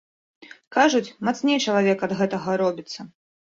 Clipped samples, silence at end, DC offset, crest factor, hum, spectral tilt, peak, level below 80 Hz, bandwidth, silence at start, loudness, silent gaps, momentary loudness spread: under 0.1%; 0.45 s; under 0.1%; 18 dB; none; -4.5 dB/octave; -4 dBFS; -66 dBFS; 7.8 kHz; 0.4 s; -22 LUFS; 0.67-0.71 s; 11 LU